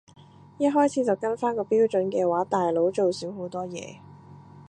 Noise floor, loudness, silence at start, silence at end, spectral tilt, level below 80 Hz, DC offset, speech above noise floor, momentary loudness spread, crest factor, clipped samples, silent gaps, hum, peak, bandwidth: -47 dBFS; -25 LUFS; 0.6 s; 0.1 s; -6 dB/octave; -70 dBFS; under 0.1%; 23 dB; 11 LU; 16 dB; under 0.1%; none; none; -10 dBFS; 10.5 kHz